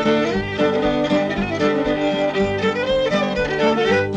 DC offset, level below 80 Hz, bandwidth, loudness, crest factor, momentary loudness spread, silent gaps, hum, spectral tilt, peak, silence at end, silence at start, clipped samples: under 0.1%; -40 dBFS; 9.6 kHz; -19 LUFS; 12 dB; 2 LU; none; none; -6 dB/octave; -6 dBFS; 0 s; 0 s; under 0.1%